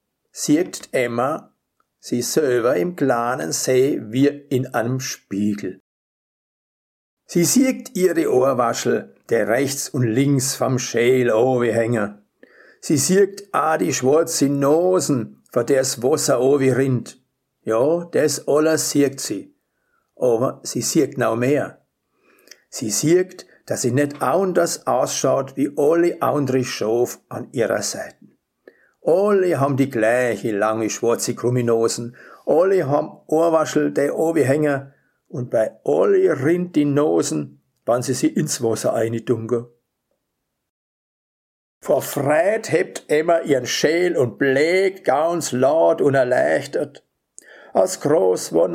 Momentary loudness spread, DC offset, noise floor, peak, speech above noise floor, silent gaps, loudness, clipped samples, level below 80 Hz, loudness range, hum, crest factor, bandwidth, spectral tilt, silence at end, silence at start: 9 LU; under 0.1%; -77 dBFS; 0 dBFS; 58 dB; 5.80-7.17 s, 40.70-41.81 s; -19 LUFS; under 0.1%; -68 dBFS; 4 LU; none; 18 dB; 16 kHz; -5 dB/octave; 0 s; 0.35 s